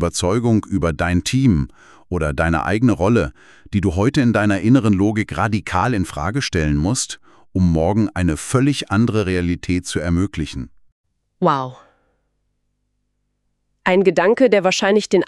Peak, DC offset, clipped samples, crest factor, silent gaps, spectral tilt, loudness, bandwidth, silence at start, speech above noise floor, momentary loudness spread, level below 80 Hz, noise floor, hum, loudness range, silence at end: 0 dBFS; under 0.1%; under 0.1%; 18 dB; 10.92-11.04 s; -6 dB/octave; -18 LUFS; 12.5 kHz; 0 s; 53 dB; 9 LU; -36 dBFS; -70 dBFS; 50 Hz at -45 dBFS; 7 LU; 0 s